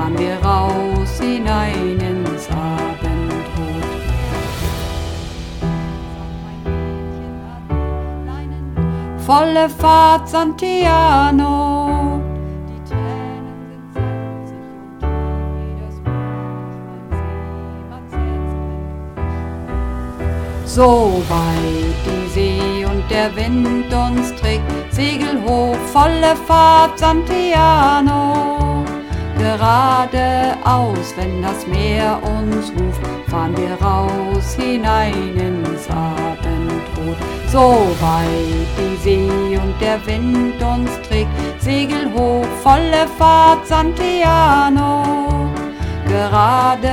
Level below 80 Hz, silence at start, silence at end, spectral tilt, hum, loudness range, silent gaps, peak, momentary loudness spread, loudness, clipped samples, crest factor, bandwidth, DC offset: -26 dBFS; 0 s; 0 s; -6 dB/octave; none; 12 LU; none; 0 dBFS; 15 LU; -16 LUFS; under 0.1%; 16 dB; 17 kHz; under 0.1%